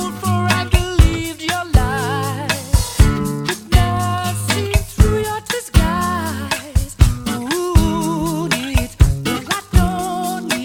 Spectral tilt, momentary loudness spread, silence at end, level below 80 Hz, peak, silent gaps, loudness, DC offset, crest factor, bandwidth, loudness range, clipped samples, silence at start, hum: -5 dB/octave; 6 LU; 0 s; -20 dBFS; 0 dBFS; none; -18 LUFS; under 0.1%; 16 dB; 19 kHz; 1 LU; under 0.1%; 0 s; none